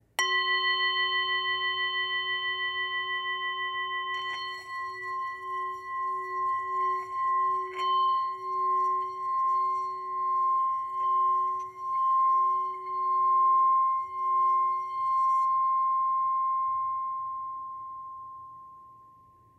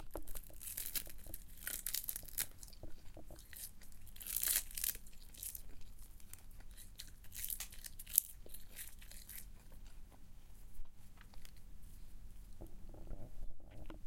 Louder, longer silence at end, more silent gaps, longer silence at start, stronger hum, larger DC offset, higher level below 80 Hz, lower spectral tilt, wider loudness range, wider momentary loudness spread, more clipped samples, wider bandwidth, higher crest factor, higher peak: first, -28 LUFS vs -42 LUFS; first, 0.55 s vs 0 s; neither; first, 0.2 s vs 0 s; neither; neither; second, -74 dBFS vs -54 dBFS; about the same, -0.5 dB/octave vs -1 dB/octave; second, 7 LU vs 17 LU; second, 10 LU vs 25 LU; neither; second, 13 kHz vs 17 kHz; second, 18 dB vs 38 dB; second, -12 dBFS vs -6 dBFS